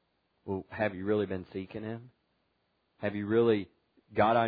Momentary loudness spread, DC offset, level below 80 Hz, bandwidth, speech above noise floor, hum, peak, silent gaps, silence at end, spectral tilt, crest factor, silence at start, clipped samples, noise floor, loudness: 15 LU; under 0.1%; -66 dBFS; 4.9 kHz; 46 dB; none; -12 dBFS; none; 0 s; -5.5 dB/octave; 20 dB; 0.45 s; under 0.1%; -76 dBFS; -32 LUFS